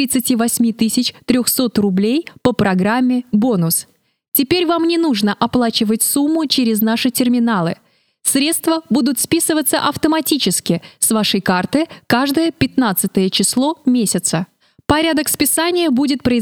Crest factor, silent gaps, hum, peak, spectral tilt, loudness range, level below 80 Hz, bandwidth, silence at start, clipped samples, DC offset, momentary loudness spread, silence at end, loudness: 16 dB; 4.28-4.32 s; none; 0 dBFS; -3.5 dB/octave; 1 LU; -48 dBFS; 18 kHz; 0 s; under 0.1%; under 0.1%; 4 LU; 0 s; -16 LUFS